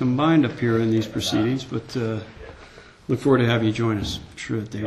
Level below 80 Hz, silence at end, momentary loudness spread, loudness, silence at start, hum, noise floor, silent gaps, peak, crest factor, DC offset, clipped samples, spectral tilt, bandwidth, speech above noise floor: -48 dBFS; 0 s; 14 LU; -23 LUFS; 0 s; none; -46 dBFS; none; -6 dBFS; 18 dB; under 0.1%; under 0.1%; -6.5 dB/octave; 13 kHz; 24 dB